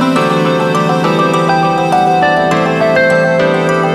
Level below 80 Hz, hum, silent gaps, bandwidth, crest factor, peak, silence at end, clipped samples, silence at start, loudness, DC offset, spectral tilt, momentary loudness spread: -48 dBFS; none; none; 14 kHz; 10 dB; 0 dBFS; 0 s; under 0.1%; 0 s; -11 LUFS; under 0.1%; -6 dB/octave; 2 LU